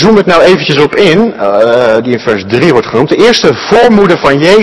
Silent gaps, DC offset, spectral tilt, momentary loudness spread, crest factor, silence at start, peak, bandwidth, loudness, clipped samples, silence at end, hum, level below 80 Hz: none; 1%; -5.5 dB/octave; 5 LU; 6 dB; 0 s; 0 dBFS; 12 kHz; -7 LUFS; 10%; 0 s; none; -38 dBFS